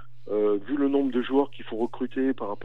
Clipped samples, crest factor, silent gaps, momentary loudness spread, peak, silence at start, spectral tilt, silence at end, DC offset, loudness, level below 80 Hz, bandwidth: under 0.1%; 16 dB; none; 7 LU; -12 dBFS; 0.25 s; -8 dB/octave; 0 s; 2%; -27 LUFS; -82 dBFS; 4.1 kHz